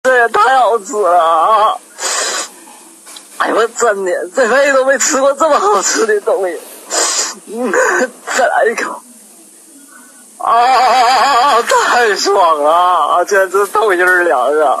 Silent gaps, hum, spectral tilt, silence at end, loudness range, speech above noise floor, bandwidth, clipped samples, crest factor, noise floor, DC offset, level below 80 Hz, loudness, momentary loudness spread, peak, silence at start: none; none; -0.5 dB/octave; 0 s; 5 LU; 29 dB; 14.5 kHz; under 0.1%; 12 dB; -40 dBFS; under 0.1%; -60 dBFS; -11 LUFS; 9 LU; 0 dBFS; 0.05 s